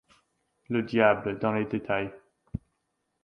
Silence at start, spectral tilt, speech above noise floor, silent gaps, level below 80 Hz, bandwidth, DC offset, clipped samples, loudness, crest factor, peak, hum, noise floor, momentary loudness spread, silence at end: 0.7 s; -8.5 dB/octave; 52 dB; none; -56 dBFS; 6.4 kHz; under 0.1%; under 0.1%; -27 LUFS; 22 dB; -8 dBFS; none; -78 dBFS; 18 LU; 0.65 s